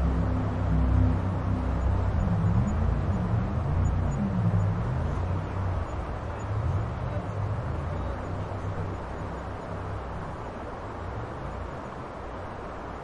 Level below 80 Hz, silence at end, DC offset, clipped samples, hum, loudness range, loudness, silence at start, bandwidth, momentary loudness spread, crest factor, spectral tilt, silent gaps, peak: -34 dBFS; 0 s; under 0.1%; under 0.1%; none; 9 LU; -30 LUFS; 0 s; 7.6 kHz; 11 LU; 16 dB; -8.5 dB/octave; none; -12 dBFS